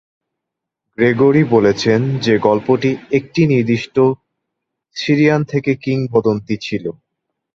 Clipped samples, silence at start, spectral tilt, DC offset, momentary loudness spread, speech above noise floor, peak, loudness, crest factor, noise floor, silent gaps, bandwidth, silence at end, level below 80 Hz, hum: under 0.1%; 1 s; -7 dB/octave; under 0.1%; 11 LU; 66 dB; 0 dBFS; -15 LUFS; 16 dB; -81 dBFS; none; 7.6 kHz; 0.65 s; -52 dBFS; none